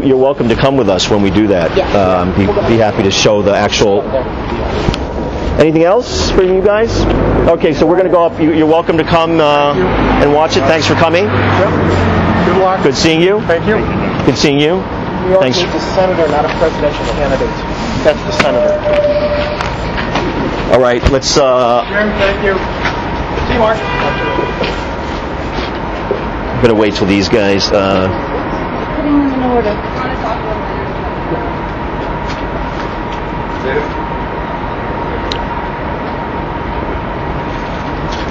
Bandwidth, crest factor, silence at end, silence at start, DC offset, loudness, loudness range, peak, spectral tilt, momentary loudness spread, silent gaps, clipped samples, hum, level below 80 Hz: 8.6 kHz; 12 dB; 0 s; 0 s; under 0.1%; -13 LUFS; 8 LU; 0 dBFS; -5.5 dB/octave; 9 LU; none; under 0.1%; none; -26 dBFS